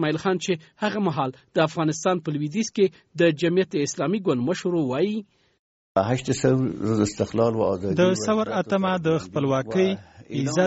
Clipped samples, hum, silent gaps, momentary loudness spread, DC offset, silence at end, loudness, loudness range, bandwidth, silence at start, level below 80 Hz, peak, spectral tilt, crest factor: under 0.1%; none; 5.59-5.95 s; 5 LU; under 0.1%; 0 s; -24 LUFS; 2 LU; 8 kHz; 0 s; -58 dBFS; -6 dBFS; -5.5 dB/octave; 18 dB